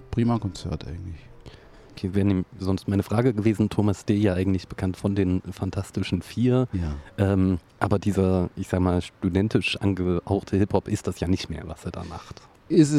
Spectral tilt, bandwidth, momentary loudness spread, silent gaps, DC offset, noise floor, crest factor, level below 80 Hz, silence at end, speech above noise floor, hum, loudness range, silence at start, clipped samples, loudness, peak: -7 dB/octave; 13 kHz; 12 LU; none; under 0.1%; -47 dBFS; 20 dB; -44 dBFS; 0 s; 23 dB; none; 2 LU; 0 s; under 0.1%; -25 LUFS; -4 dBFS